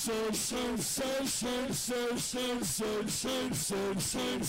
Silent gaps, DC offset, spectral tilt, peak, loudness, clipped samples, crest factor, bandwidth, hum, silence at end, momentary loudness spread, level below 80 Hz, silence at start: none; under 0.1%; -3 dB/octave; -28 dBFS; -33 LUFS; under 0.1%; 6 dB; 16 kHz; none; 0 s; 1 LU; -56 dBFS; 0 s